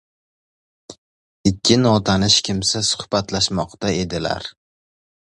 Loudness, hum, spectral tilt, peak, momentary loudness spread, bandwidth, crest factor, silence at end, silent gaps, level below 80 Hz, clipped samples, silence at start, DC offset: -18 LUFS; none; -4 dB/octave; 0 dBFS; 9 LU; 11.5 kHz; 20 dB; 0.8 s; 0.98-1.44 s; -44 dBFS; under 0.1%; 0.9 s; under 0.1%